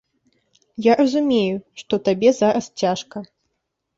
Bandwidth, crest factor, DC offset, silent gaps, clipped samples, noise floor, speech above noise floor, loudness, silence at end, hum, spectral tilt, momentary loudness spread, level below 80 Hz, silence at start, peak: 7.8 kHz; 18 dB; under 0.1%; none; under 0.1%; -76 dBFS; 57 dB; -19 LUFS; 0.7 s; none; -5.5 dB/octave; 15 LU; -62 dBFS; 0.8 s; -2 dBFS